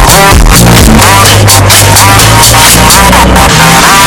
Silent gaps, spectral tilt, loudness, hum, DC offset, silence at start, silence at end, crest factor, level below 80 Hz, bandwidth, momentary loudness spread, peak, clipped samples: none; -3 dB/octave; -1 LUFS; none; under 0.1%; 0 s; 0 s; 2 dB; -10 dBFS; 16 kHz; 2 LU; 0 dBFS; 60%